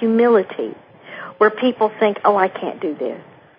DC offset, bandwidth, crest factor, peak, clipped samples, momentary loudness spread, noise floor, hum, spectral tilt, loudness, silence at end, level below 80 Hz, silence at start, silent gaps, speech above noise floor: under 0.1%; 5.2 kHz; 18 dB; -2 dBFS; under 0.1%; 19 LU; -36 dBFS; none; -10.5 dB/octave; -18 LUFS; 0.35 s; -72 dBFS; 0 s; none; 18 dB